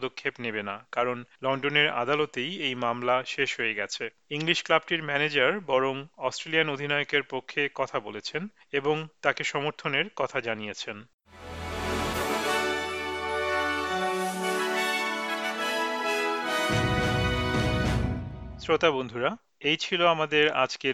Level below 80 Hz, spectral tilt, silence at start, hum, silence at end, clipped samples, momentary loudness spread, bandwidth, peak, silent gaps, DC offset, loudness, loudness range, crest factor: -46 dBFS; -4 dB/octave; 0 s; none; 0 s; under 0.1%; 9 LU; 16 kHz; -6 dBFS; 11.14-11.18 s; under 0.1%; -27 LUFS; 4 LU; 22 dB